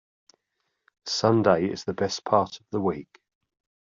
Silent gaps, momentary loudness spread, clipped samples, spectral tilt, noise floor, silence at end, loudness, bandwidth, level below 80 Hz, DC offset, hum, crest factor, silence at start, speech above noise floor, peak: none; 9 LU; under 0.1%; -5.5 dB/octave; -79 dBFS; 0.9 s; -25 LUFS; 7.6 kHz; -66 dBFS; under 0.1%; none; 22 dB; 1.05 s; 54 dB; -6 dBFS